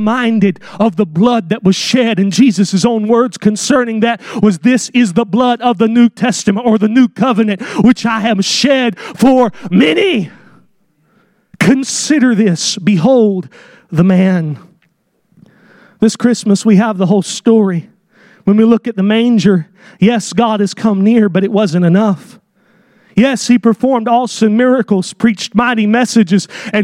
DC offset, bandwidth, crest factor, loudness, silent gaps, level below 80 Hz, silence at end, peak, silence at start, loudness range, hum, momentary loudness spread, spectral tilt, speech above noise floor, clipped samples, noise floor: under 0.1%; 12 kHz; 12 dB; -12 LUFS; none; -52 dBFS; 0 s; 0 dBFS; 0 s; 2 LU; none; 5 LU; -5.5 dB/octave; 48 dB; under 0.1%; -59 dBFS